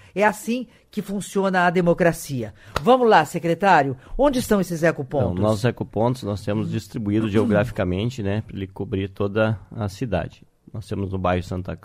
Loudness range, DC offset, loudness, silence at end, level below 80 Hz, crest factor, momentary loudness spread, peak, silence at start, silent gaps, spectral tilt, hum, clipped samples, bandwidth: 7 LU; under 0.1%; -22 LUFS; 0.1 s; -44 dBFS; 18 dB; 12 LU; -2 dBFS; 0.15 s; none; -6.5 dB/octave; none; under 0.1%; 16 kHz